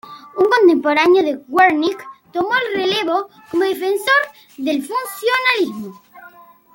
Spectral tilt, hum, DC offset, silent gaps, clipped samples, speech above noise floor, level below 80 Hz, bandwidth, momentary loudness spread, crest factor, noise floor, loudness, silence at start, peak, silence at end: -3.5 dB/octave; none; under 0.1%; none; under 0.1%; 27 dB; -64 dBFS; 17 kHz; 13 LU; 16 dB; -44 dBFS; -16 LUFS; 0.05 s; -2 dBFS; 0.45 s